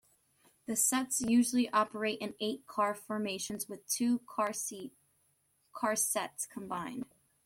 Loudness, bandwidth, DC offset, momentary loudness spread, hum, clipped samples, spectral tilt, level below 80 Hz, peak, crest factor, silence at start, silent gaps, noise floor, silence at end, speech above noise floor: -33 LUFS; 16.5 kHz; under 0.1%; 13 LU; none; under 0.1%; -2.5 dB/octave; -72 dBFS; -16 dBFS; 18 dB; 0.7 s; none; -74 dBFS; 0.4 s; 41 dB